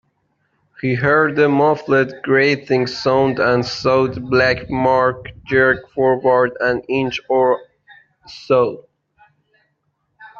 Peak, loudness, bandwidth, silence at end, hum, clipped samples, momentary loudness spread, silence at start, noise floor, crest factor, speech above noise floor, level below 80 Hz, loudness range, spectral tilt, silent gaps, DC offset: -2 dBFS; -16 LUFS; 7.2 kHz; 0 s; none; under 0.1%; 6 LU; 0.85 s; -69 dBFS; 16 dB; 52 dB; -50 dBFS; 5 LU; -6.5 dB/octave; none; under 0.1%